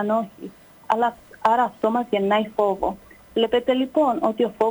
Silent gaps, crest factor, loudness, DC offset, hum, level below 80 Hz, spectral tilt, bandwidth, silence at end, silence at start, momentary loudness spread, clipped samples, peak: none; 16 dB; -22 LUFS; under 0.1%; none; -56 dBFS; -6 dB/octave; over 20 kHz; 0 s; 0 s; 9 LU; under 0.1%; -6 dBFS